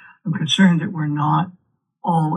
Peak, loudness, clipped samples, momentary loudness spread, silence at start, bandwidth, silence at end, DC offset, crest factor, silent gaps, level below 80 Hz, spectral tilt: -2 dBFS; -19 LUFS; under 0.1%; 12 LU; 0.25 s; 10 kHz; 0 s; under 0.1%; 16 dB; none; -76 dBFS; -5.5 dB/octave